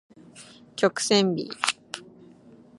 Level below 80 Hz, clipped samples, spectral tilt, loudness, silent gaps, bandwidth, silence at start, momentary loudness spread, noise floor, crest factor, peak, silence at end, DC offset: -74 dBFS; under 0.1%; -3.5 dB/octave; -24 LUFS; none; 11.5 kHz; 0.35 s; 21 LU; -52 dBFS; 26 dB; -2 dBFS; 0.75 s; under 0.1%